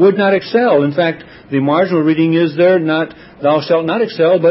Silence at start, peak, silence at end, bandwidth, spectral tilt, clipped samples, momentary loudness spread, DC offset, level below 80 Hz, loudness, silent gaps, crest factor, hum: 0 s; 0 dBFS; 0 s; 5.8 kHz; -11 dB/octave; under 0.1%; 7 LU; under 0.1%; -58 dBFS; -14 LUFS; none; 12 dB; none